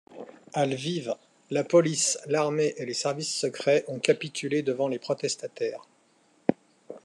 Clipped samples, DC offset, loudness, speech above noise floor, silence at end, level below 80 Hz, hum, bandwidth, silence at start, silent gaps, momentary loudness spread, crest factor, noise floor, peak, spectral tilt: under 0.1%; under 0.1%; -27 LUFS; 37 dB; 0.05 s; -78 dBFS; none; 12 kHz; 0.1 s; none; 12 LU; 24 dB; -64 dBFS; -4 dBFS; -4 dB/octave